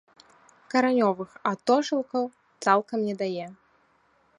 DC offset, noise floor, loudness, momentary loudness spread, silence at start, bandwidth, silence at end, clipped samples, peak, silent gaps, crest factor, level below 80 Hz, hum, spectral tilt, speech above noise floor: under 0.1%; -65 dBFS; -26 LUFS; 8 LU; 0.75 s; 11 kHz; 0.85 s; under 0.1%; -6 dBFS; none; 22 dB; -76 dBFS; none; -5 dB/octave; 40 dB